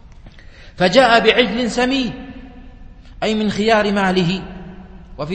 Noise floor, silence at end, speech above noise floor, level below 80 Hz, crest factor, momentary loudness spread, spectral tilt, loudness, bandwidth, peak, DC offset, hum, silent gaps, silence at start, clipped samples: -39 dBFS; 0 s; 24 dB; -40 dBFS; 18 dB; 22 LU; -5 dB/octave; -16 LUFS; 8.8 kHz; 0 dBFS; under 0.1%; none; none; 0.25 s; under 0.1%